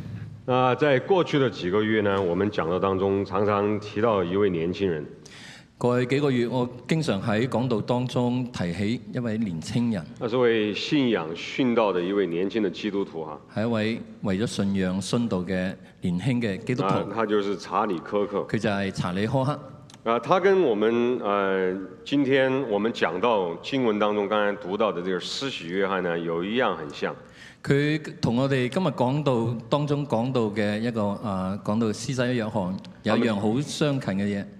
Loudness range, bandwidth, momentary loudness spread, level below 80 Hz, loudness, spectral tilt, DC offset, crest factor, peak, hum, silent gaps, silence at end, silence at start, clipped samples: 3 LU; 12.5 kHz; 7 LU; -62 dBFS; -25 LUFS; -6.5 dB/octave; under 0.1%; 20 dB; -4 dBFS; none; none; 0 s; 0 s; under 0.1%